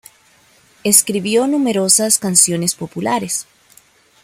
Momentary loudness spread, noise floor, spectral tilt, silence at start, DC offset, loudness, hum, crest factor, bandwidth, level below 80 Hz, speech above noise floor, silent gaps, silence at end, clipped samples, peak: 11 LU; -52 dBFS; -3 dB/octave; 0.85 s; under 0.1%; -14 LUFS; none; 18 dB; over 20 kHz; -60 dBFS; 36 dB; none; 0.8 s; under 0.1%; 0 dBFS